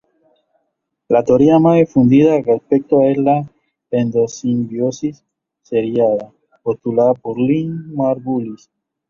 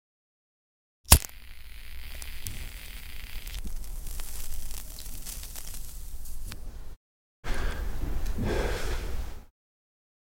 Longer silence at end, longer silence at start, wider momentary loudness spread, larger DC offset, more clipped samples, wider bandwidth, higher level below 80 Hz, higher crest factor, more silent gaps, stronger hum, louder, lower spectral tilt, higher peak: second, 0.55 s vs 0.85 s; about the same, 1.1 s vs 1.05 s; about the same, 12 LU vs 14 LU; neither; neither; second, 7.2 kHz vs 17 kHz; second, -54 dBFS vs -34 dBFS; second, 16 dB vs 28 dB; second, none vs 6.96-7.43 s; neither; first, -16 LUFS vs -32 LUFS; first, -8 dB/octave vs -3 dB/octave; about the same, 0 dBFS vs -2 dBFS